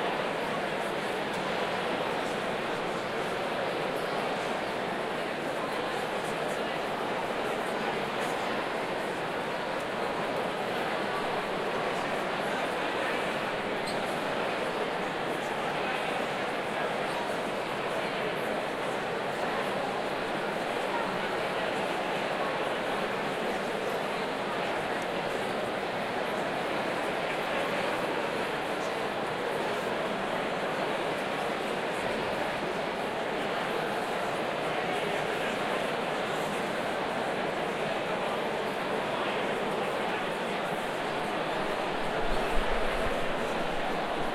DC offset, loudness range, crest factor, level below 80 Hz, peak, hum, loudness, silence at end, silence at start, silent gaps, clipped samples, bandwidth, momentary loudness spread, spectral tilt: under 0.1%; 1 LU; 18 dB; -50 dBFS; -12 dBFS; none; -31 LUFS; 0 s; 0 s; none; under 0.1%; 16.5 kHz; 2 LU; -4 dB/octave